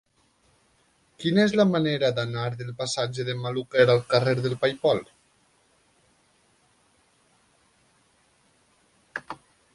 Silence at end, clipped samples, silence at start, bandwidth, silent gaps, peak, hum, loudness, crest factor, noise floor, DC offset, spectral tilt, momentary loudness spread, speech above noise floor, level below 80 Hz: 0.4 s; under 0.1%; 1.2 s; 11.5 kHz; none; -4 dBFS; none; -24 LUFS; 22 dB; -65 dBFS; under 0.1%; -5.5 dB/octave; 17 LU; 42 dB; -64 dBFS